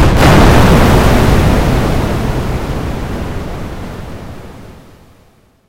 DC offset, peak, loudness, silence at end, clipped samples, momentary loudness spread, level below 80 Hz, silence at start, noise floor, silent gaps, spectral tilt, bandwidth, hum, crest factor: under 0.1%; 0 dBFS; -11 LUFS; 0.95 s; 0.5%; 20 LU; -16 dBFS; 0 s; -48 dBFS; none; -6 dB/octave; 16.5 kHz; none; 12 dB